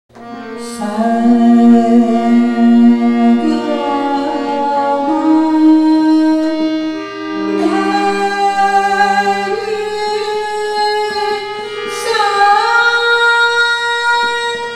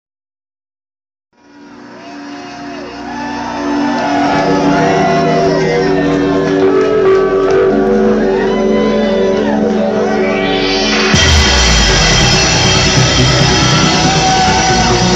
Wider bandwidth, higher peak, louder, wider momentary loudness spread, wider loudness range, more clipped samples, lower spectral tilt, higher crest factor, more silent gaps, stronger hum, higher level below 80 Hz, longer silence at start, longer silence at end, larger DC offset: first, 11.5 kHz vs 9 kHz; about the same, 0 dBFS vs 0 dBFS; about the same, -12 LUFS vs -10 LUFS; about the same, 11 LU vs 12 LU; second, 4 LU vs 11 LU; neither; about the same, -4.5 dB/octave vs -4 dB/octave; about the same, 12 dB vs 12 dB; neither; neither; second, -56 dBFS vs -24 dBFS; second, 0.15 s vs 1.6 s; about the same, 0 s vs 0 s; neither